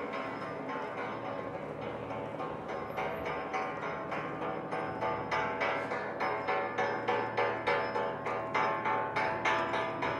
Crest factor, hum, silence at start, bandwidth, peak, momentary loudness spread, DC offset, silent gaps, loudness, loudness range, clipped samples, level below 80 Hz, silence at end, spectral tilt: 16 dB; none; 0 s; 12.5 kHz; -18 dBFS; 8 LU; under 0.1%; none; -34 LUFS; 6 LU; under 0.1%; -66 dBFS; 0 s; -5.5 dB/octave